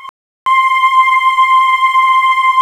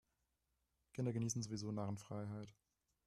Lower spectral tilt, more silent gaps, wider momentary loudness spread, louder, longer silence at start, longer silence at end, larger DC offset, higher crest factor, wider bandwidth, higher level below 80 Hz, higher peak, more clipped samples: second, 4 dB/octave vs -6 dB/octave; first, 0.09-0.46 s vs none; second, 3 LU vs 12 LU; first, -10 LUFS vs -45 LUFS; second, 0 s vs 0.95 s; second, 0 s vs 0.55 s; neither; second, 10 dB vs 18 dB; about the same, 13.5 kHz vs 13 kHz; first, -60 dBFS vs -76 dBFS; first, 0 dBFS vs -28 dBFS; neither